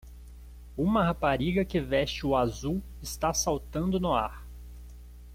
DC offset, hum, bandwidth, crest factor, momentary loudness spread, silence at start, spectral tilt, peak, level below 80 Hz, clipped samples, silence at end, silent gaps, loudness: under 0.1%; 60 Hz at -40 dBFS; 16.5 kHz; 18 dB; 22 LU; 0.05 s; -5 dB/octave; -12 dBFS; -42 dBFS; under 0.1%; 0 s; none; -29 LUFS